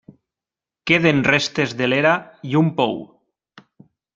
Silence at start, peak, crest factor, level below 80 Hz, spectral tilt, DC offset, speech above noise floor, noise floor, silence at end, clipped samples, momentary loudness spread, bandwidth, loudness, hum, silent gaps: 0.85 s; 0 dBFS; 20 dB; -58 dBFS; -5.5 dB/octave; under 0.1%; 71 dB; -89 dBFS; 1.1 s; under 0.1%; 8 LU; 7.6 kHz; -18 LUFS; none; none